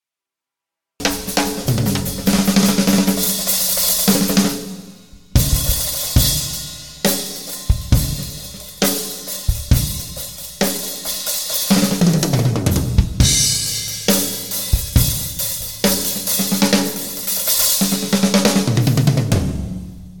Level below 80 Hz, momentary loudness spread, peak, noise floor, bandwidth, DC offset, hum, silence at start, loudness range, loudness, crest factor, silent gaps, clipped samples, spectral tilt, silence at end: -28 dBFS; 10 LU; 0 dBFS; -87 dBFS; 19.5 kHz; 0.6%; none; 1 s; 5 LU; -17 LUFS; 18 dB; none; under 0.1%; -4 dB/octave; 0 s